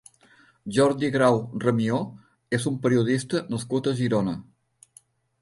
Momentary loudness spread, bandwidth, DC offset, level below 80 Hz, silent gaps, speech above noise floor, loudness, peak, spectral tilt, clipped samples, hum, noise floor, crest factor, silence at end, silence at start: 8 LU; 11.5 kHz; under 0.1%; -60 dBFS; none; 34 dB; -24 LUFS; -6 dBFS; -6.5 dB/octave; under 0.1%; none; -58 dBFS; 18 dB; 1 s; 0.65 s